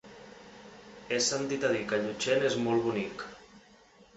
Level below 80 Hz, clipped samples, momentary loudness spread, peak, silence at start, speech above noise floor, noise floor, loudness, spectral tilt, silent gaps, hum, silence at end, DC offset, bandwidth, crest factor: -66 dBFS; under 0.1%; 22 LU; -16 dBFS; 0.05 s; 29 dB; -59 dBFS; -30 LUFS; -3.5 dB/octave; none; none; 0.6 s; under 0.1%; 8.4 kHz; 16 dB